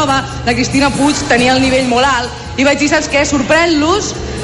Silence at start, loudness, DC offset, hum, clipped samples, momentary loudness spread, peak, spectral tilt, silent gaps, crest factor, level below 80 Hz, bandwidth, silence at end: 0 s; -12 LUFS; under 0.1%; none; under 0.1%; 5 LU; 0 dBFS; -4 dB/octave; none; 12 dB; -30 dBFS; 11.5 kHz; 0 s